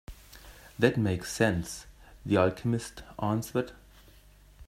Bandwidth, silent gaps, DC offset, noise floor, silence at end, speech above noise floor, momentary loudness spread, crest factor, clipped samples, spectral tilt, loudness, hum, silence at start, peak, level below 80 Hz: 16 kHz; none; under 0.1%; -56 dBFS; 0.05 s; 27 dB; 22 LU; 22 dB; under 0.1%; -6 dB/octave; -29 LUFS; none; 0.1 s; -8 dBFS; -54 dBFS